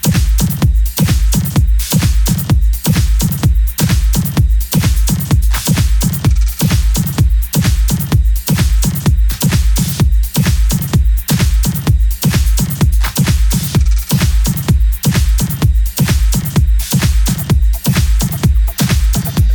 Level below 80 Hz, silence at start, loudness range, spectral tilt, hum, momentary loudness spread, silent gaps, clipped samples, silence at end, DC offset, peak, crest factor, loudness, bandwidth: -14 dBFS; 0.05 s; 0 LU; -5 dB/octave; none; 1 LU; none; under 0.1%; 0 s; under 0.1%; 0 dBFS; 10 dB; -13 LUFS; 19.5 kHz